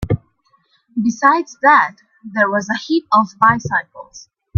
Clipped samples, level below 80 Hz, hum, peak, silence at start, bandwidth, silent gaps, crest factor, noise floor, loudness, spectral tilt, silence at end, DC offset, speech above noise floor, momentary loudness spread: under 0.1%; -46 dBFS; none; 0 dBFS; 0 s; 7.4 kHz; none; 16 dB; -60 dBFS; -16 LUFS; -5.5 dB/octave; 0.4 s; under 0.1%; 44 dB; 13 LU